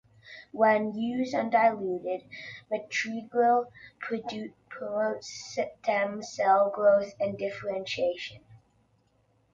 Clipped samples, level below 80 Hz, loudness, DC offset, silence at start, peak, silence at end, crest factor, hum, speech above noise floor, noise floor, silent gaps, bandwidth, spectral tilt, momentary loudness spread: under 0.1%; -70 dBFS; -28 LUFS; under 0.1%; 0.25 s; -12 dBFS; 0.95 s; 18 dB; none; 40 dB; -68 dBFS; none; 7.6 kHz; -4.5 dB/octave; 17 LU